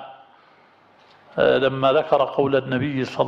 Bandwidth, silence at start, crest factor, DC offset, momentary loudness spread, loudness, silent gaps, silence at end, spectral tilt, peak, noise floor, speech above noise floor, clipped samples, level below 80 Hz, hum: 7.6 kHz; 0 s; 18 dB; under 0.1%; 6 LU; -20 LUFS; none; 0 s; -7 dB/octave; -4 dBFS; -54 dBFS; 34 dB; under 0.1%; -58 dBFS; none